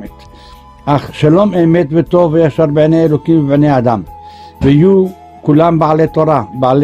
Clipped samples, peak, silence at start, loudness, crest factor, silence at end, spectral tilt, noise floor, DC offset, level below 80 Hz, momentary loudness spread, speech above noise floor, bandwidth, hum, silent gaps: under 0.1%; 0 dBFS; 0 s; -11 LUFS; 10 dB; 0 s; -9 dB/octave; -36 dBFS; under 0.1%; -38 dBFS; 6 LU; 27 dB; 8.6 kHz; none; none